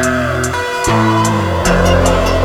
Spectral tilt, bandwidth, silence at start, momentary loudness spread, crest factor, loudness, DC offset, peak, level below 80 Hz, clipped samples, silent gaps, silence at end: -5 dB/octave; 18 kHz; 0 s; 5 LU; 12 dB; -13 LUFS; under 0.1%; 0 dBFS; -22 dBFS; under 0.1%; none; 0 s